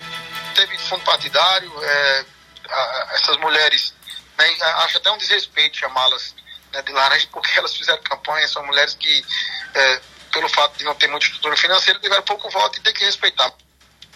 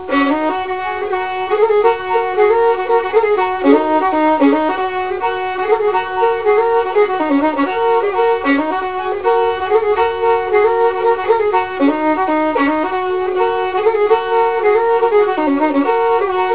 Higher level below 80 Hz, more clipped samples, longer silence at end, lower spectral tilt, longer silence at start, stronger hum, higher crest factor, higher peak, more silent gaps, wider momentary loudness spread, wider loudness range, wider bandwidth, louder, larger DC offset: second, -62 dBFS vs -48 dBFS; neither; first, 0.65 s vs 0 s; second, 0 dB/octave vs -8.5 dB/octave; about the same, 0 s vs 0 s; neither; about the same, 18 dB vs 14 dB; about the same, 0 dBFS vs 0 dBFS; neither; about the same, 8 LU vs 6 LU; about the same, 2 LU vs 1 LU; first, 16 kHz vs 4 kHz; about the same, -16 LUFS vs -15 LUFS; second, under 0.1% vs 1%